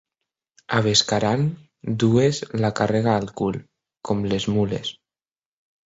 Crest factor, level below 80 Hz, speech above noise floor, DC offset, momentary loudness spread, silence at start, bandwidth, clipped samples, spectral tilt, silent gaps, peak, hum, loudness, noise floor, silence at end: 20 dB; -52 dBFS; over 69 dB; under 0.1%; 11 LU; 0.7 s; 8 kHz; under 0.1%; -5 dB/octave; none; -4 dBFS; none; -22 LUFS; under -90 dBFS; 0.95 s